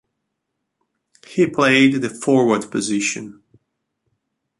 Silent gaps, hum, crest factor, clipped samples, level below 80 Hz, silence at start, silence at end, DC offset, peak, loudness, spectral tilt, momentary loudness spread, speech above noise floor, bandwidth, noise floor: none; none; 18 dB; under 0.1%; -64 dBFS; 1.3 s; 1.3 s; under 0.1%; -2 dBFS; -17 LUFS; -4.5 dB/octave; 13 LU; 60 dB; 11.5 kHz; -77 dBFS